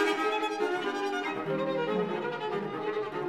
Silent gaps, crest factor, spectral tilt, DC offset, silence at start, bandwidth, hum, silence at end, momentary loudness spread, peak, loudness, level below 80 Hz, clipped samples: none; 16 dB; -5 dB/octave; under 0.1%; 0 s; 14.5 kHz; none; 0 s; 4 LU; -16 dBFS; -31 LUFS; -72 dBFS; under 0.1%